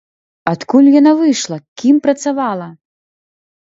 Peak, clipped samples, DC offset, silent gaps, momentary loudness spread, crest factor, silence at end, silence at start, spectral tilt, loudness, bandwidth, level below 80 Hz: 0 dBFS; under 0.1%; under 0.1%; 1.68-1.76 s; 15 LU; 14 dB; 0.95 s; 0.45 s; -5 dB/octave; -13 LUFS; 8 kHz; -62 dBFS